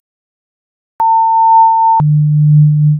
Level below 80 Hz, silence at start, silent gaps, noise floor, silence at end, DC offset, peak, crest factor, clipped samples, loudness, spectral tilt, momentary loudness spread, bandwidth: -48 dBFS; 1 s; none; under -90 dBFS; 0 s; under 0.1%; -2 dBFS; 8 dB; under 0.1%; -9 LUFS; -11 dB/octave; 4 LU; 1.6 kHz